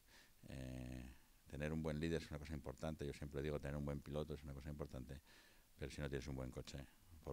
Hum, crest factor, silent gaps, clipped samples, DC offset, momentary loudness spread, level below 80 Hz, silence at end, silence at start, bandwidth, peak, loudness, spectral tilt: none; 20 dB; none; under 0.1%; under 0.1%; 16 LU; -58 dBFS; 0 s; 0.1 s; 16 kHz; -30 dBFS; -49 LUFS; -6.5 dB/octave